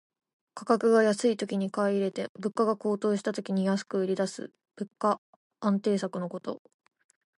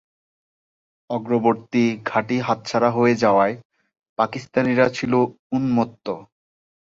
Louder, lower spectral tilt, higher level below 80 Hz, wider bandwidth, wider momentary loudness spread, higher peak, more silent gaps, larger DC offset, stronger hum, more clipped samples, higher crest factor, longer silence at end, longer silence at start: second, -28 LUFS vs -21 LUFS; about the same, -6 dB/octave vs -6.5 dB/octave; second, -80 dBFS vs -60 dBFS; first, 11.5 kHz vs 7.6 kHz; first, 17 LU vs 12 LU; second, -12 dBFS vs -4 dBFS; first, 2.29-2.35 s, 5.18-5.50 s vs 3.65-3.70 s, 4.09-4.16 s, 5.39-5.50 s; neither; neither; neither; about the same, 18 dB vs 18 dB; first, 0.8 s vs 0.6 s; second, 0.55 s vs 1.1 s